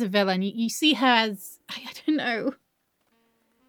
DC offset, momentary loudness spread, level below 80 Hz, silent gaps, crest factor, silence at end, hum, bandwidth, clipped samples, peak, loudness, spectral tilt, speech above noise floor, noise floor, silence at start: under 0.1%; 17 LU; -86 dBFS; none; 22 dB; 1.15 s; none; over 20 kHz; under 0.1%; -4 dBFS; -24 LUFS; -4 dB/octave; 48 dB; -72 dBFS; 0 s